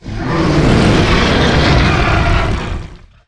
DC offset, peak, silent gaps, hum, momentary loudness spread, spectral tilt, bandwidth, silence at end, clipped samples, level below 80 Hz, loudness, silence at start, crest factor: under 0.1%; 0 dBFS; none; none; 9 LU; -6 dB/octave; 11 kHz; 0.3 s; under 0.1%; -18 dBFS; -12 LUFS; 0.05 s; 12 dB